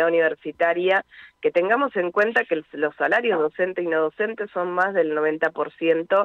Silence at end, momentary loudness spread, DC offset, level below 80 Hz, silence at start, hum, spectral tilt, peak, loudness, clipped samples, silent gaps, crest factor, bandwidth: 0 s; 6 LU; under 0.1%; -72 dBFS; 0 s; none; -6.5 dB/octave; -8 dBFS; -22 LUFS; under 0.1%; none; 14 dB; 6.8 kHz